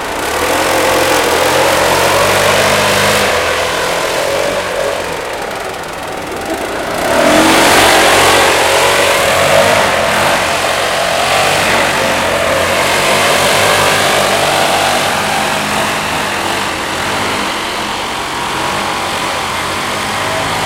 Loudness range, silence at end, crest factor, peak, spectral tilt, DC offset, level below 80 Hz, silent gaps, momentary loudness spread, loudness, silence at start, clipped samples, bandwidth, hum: 7 LU; 0 s; 12 dB; 0 dBFS; -2.5 dB/octave; under 0.1%; -38 dBFS; none; 9 LU; -11 LUFS; 0 s; under 0.1%; 17.5 kHz; none